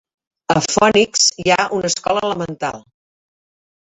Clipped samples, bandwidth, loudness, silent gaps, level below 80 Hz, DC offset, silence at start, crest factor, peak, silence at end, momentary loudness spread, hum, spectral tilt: under 0.1%; 8.4 kHz; -16 LUFS; none; -52 dBFS; under 0.1%; 0.5 s; 18 dB; -2 dBFS; 1.05 s; 12 LU; none; -2.5 dB/octave